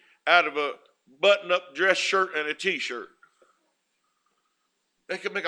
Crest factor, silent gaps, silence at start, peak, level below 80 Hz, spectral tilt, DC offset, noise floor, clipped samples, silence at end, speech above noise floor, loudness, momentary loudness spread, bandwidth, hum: 24 dB; none; 0.25 s; -2 dBFS; -88 dBFS; -2 dB/octave; under 0.1%; -76 dBFS; under 0.1%; 0 s; 51 dB; -24 LUFS; 12 LU; 11 kHz; none